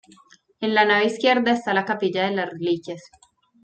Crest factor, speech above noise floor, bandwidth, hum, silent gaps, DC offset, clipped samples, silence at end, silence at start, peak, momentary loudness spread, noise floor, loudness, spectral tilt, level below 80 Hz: 20 dB; 33 dB; 9 kHz; none; none; under 0.1%; under 0.1%; 0.65 s; 0.6 s; -2 dBFS; 10 LU; -54 dBFS; -21 LUFS; -5 dB/octave; -68 dBFS